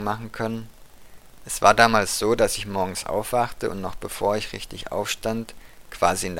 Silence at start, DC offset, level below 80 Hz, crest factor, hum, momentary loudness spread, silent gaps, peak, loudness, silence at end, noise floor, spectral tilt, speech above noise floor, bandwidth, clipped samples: 0 s; under 0.1%; -44 dBFS; 24 dB; none; 15 LU; none; 0 dBFS; -23 LUFS; 0 s; -44 dBFS; -3.5 dB/octave; 21 dB; 17 kHz; under 0.1%